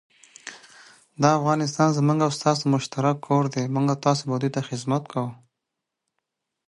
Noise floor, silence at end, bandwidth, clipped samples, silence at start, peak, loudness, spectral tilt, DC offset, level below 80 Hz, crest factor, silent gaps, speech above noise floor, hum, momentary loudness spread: -83 dBFS; 1.35 s; 11.5 kHz; under 0.1%; 0.45 s; -4 dBFS; -23 LUFS; -6 dB/octave; under 0.1%; -68 dBFS; 20 dB; none; 61 dB; none; 11 LU